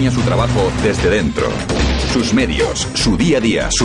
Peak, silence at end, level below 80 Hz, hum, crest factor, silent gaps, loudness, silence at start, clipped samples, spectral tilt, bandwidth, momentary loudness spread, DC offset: -4 dBFS; 0 s; -24 dBFS; none; 10 dB; none; -15 LUFS; 0 s; under 0.1%; -4.5 dB/octave; 11 kHz; 3 LU; under 0.1%